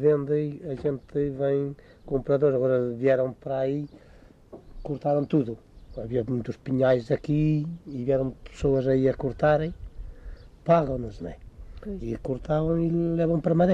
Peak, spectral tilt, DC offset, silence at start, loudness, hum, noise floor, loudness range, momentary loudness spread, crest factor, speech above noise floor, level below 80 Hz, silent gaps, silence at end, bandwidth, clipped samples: -8 dBFS; -9.5 dB/octave; under 0.1%; 0 s; -26 LUFS; none; -50 dBFS; 3 LU; 17 LU; 18 dB; 25 dB; -46 dBFS; none; 0 s; 8 kHz; under 0.1%